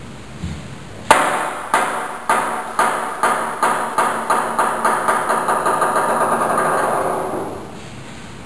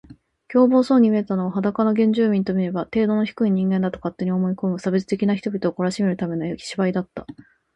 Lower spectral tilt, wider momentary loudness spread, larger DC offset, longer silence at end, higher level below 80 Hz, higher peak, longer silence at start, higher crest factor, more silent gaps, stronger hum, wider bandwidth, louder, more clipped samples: second, -3.5 dB/octave vs -7.5 dB/octave; first, 15 LU vs 9 LU; first, 1% vs under 0.1%; second, 0 s vs 0.4 s; first, -48 dBFS vs -58 dBFS; first, 0 dBFS vs -4 dBFS; about the same, 0 s vs 0.1 s; about the same, 20 dB vs 16 dB; neither; neither; about the same, 11 kHz vs 10.5 kHz; first, -18 LUFS vs -21 LUFS; neither